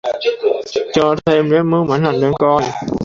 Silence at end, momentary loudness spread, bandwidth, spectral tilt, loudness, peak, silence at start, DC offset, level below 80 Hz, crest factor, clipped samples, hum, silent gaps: 0 s; 5 LU; 7.6 kHz; -6.5 dB/octave; -15 LUFS; -2 dBFS; 0.05 s; under 0.1%; -46 dBFS; 14 dB; under 0.1%; none; none